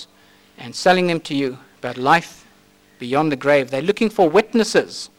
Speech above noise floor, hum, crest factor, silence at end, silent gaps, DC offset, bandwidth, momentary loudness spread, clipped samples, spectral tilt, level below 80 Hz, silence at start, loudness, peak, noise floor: 35 dB; none; 18 dB; 0.1 s; none; under 0.1%; 16.5 kHz; 15 LU; under 0.1%; -5 dB/octave; -58 dBFS; 0 s; -18 LUFS; -2 dBFS; -53 dBFS